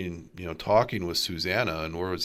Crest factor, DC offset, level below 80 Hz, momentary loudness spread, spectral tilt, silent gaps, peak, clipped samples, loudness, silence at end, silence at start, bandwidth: 18 dB; under 0.1%; -54 dBFS; 13 LU; -4.5 dB/octave; none; -10 dBFS; under 0.1%; -27 LUFS; 0 s; 0 s; 16 kHz